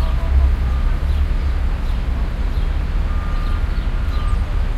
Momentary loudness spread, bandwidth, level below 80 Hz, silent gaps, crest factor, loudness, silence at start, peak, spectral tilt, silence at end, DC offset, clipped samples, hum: 5 LU; 5.6 kHz; -18 dBFS; none; 12 dB; -22 LUFS; 0 s; -4 dBFS; -7 dB/octave; 0 s; under 0.1%; under 0.1%; none